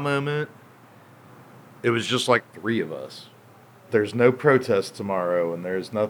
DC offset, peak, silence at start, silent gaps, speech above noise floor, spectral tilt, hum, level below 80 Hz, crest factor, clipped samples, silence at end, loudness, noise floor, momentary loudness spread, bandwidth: under 0.1%; -4 dBFS; 0 s; none; 27 dB; -5.5 dB/octave; none; -78 dBFS; 22 dB; under 0.1%; 0 s; -23 LUFS; -51 dBFS; 12 LU; over 20 kHz